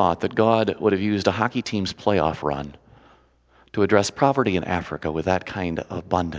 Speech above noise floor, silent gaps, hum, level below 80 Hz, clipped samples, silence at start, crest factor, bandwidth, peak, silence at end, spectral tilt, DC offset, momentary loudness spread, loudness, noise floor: 35 dB; none; none; -44 dBFS; under 0.1%; 0 s; 22 dB; 8 kHz; 0 dBFS; 0 s; -6 dB/octave; under 0.1%; 8 LU; -23 LUFS; -57 dBFS